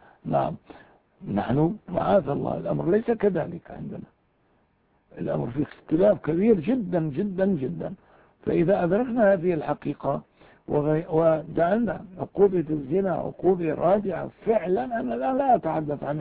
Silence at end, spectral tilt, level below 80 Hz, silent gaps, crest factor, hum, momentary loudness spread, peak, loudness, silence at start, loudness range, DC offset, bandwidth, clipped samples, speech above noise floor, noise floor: 0 s; -12 dB/octave; -54 dBFS; none; 18 dB; none; 12 LU; -8 dBFS; -25 LUFS; 0.25 s; 3 LU; under 0.1%; 4.7 kHz; under 0.1%; 42 dB; -66 dBFS